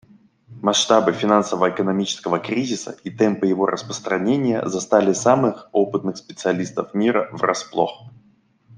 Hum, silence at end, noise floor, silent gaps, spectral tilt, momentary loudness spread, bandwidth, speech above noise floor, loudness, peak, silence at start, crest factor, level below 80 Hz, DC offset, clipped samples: none; 0 s; -58 dBFS; none; -4.5 dB/octave; 8 LU; 10.5 kHz; 38 dB; -20 LUFS; -2 dBFS; 0.5 s; 20 dB; -64 dBFS; under 0.1%; under 0.1%